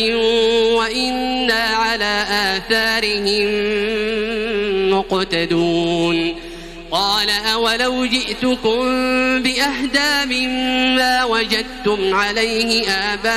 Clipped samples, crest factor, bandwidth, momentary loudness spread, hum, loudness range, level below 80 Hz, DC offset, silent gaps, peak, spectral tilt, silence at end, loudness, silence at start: under 0.1%; 16 dB; 16 kHz; 4 LU; none; 2 LU; -40 dBFS; under 0.1%; none; -2 dBFS; -3 dB/octave; 0 s; -17 LUFS; 0 s